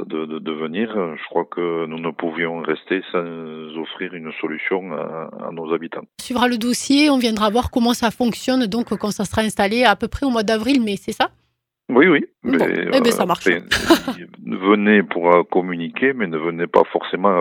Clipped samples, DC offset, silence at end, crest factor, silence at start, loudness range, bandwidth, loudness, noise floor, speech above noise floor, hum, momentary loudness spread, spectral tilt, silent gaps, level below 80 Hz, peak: under 0.1%; under 0.1%; 0 s; 20 dB; 0 s; 8 LU; 19 kHz; -19 LUFS; -42 dBFS; 23 dB; none; 13 LU; -4.5 dB/octave; none; -46 dBFS; 0 dBFS